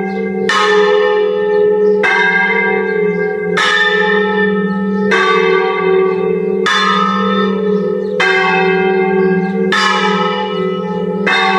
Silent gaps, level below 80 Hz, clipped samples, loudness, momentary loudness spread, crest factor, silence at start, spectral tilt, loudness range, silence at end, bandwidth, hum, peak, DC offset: none; -60 dBFS; under 0.1%; -12 LUFS; 6 LU; 12 dB; 0 s; -5 dB/octave; 1 LU; 0 s; 10.5 kHz; none; 0 dBFS; under 0.1%